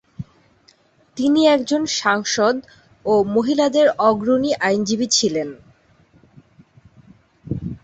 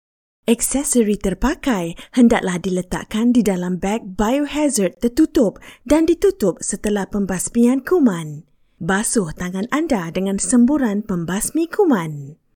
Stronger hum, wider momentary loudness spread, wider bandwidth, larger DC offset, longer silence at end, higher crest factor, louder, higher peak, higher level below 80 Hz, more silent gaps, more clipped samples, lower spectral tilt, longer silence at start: neither; first, 15 LU vs 8 LU; second, 8.4 kHz vs 17.5 kHz; neither; second, 0.05 s vs 0.2 s; about the same, 18 dB vs 16 dB; about the same, -18 LUFS vs -18 LUFS; about the same, -2 dBFS vs -2 dBFS; second, -52 dBFS vs -38 dBFS; neither; neither; second, -3.5 dB/octave vs -5 dB/octave; second, 0.2 s vs 0.45 s